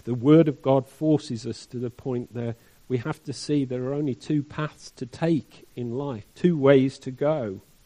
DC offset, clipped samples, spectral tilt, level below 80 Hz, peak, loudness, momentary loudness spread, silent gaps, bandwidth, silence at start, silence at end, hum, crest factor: under 0.1%; under 0.1%; -7.5 dB/octave; -60 dBFS; -4 dBFS; -25 LUFS; 16 LU; none; 11.5 kHz; 0.05 s; 0.25 s; none; 20 dB